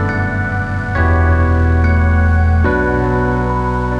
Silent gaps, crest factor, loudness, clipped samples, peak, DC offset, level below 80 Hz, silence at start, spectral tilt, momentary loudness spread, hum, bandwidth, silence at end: none; 12 dB; -14 LUFS; under 0.1%; -2 dBFS; under 0.1%; -22 dBFS; 0 s; -9 dB/octave; 5 LU; none; 5.4 kHz; 0 s